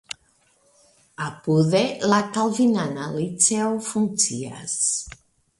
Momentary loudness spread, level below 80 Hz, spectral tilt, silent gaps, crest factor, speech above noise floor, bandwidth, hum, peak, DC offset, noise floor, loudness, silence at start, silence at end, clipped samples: 13 LU; -58 dBFS; -4 dB/octave; none; 22 dB; 40 dB; 11.5 kHz; none; -2 dBFS; under 0.1%; -62 dBFS; -22 LUFS; 0.1 s; 0.45 s; under 0.1%